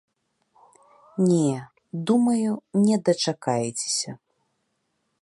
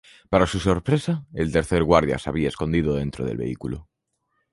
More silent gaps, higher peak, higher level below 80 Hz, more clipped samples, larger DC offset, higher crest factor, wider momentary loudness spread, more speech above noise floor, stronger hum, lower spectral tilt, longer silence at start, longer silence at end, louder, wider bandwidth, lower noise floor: neither; second, -8 dBFS vs -2 dBFS; second, -72 dBFS vs -38 dBFS; neither; neither; about the same, 18 dB vs 20 dB; first, 13 LU vs 10 LU; about the same, 52 dB vs 52 dB; neither; about the same, -5.5 dB/octave vs -6.5 dB/octave; first, 1.15 s vs 0.3 s; first, 1.05 s vs 0.7 s; about the same, -23 LUFS vs -23 LUFS; about the same, 11.5 kHz vs 11.5 kHz; about the same, -74 dBFS vs -74 dBFS